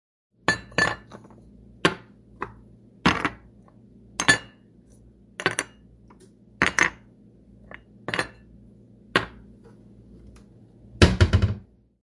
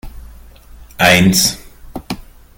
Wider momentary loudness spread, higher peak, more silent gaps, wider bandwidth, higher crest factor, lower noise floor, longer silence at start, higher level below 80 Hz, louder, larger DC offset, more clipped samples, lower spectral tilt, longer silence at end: second, 20 LU vs 23 LU; about the same, 0 dBFS vs 0 dBFS; neither; second, 11.5 kHz vs 17 kHz; first, 28 dB vs 16 dB; first, -53 dBFS vs -38 dBFS; first, 0.5 s vs 0.05 s; about the same, -40 dBFS vs -36 dBFS; second, -24 LUFS vs -11 LUFS; neither; neither; about the same, -4 dB/octave vs -3.5 dB/octave; about the same, 0.45 s vs 0.35 s